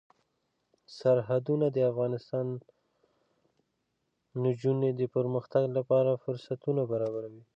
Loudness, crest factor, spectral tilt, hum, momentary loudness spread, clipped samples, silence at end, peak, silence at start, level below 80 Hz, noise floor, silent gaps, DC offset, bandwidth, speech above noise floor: -30 LUFS; 16 dB; -9.5 dB/octave; none; 8 LU; under 0.1%; 0.15 s; -14 dBFS; 0.9 s; -78 dBFS; -80 dBFS; none; under 0.1%; 7.6 kHz; 51 dB